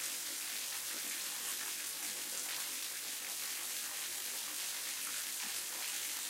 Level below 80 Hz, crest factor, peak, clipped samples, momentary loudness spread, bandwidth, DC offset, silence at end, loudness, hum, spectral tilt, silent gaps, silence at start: -88 dBFS; 20 dB; -22 dBFS; under 0.1%; 1 LU; 16.5 kHz; under 0.1%; 0 s; -38 LUFS; none; 2.5 dB/octave; none; 0 s